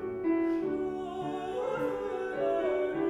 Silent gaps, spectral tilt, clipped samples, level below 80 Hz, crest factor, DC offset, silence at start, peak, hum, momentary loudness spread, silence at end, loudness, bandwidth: none; -7 dB/octave; under 0.1%; -62 dBFS; 12 dB; under 0.1%; 0 s; -18 dBFS; none; 6 LU; 0 s; -32 LUFS; 10 kHz